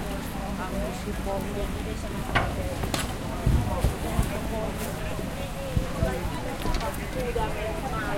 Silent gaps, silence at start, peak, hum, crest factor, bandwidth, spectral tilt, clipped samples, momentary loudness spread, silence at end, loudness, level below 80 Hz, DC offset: none; 0 s; -8 dBFS; none; 20 dB; 16.5 kHz; -5.5 dB/octave; under 0.1%; 6 LU; 0 s; -30 LUFS; -34 dBFS; under 0.1%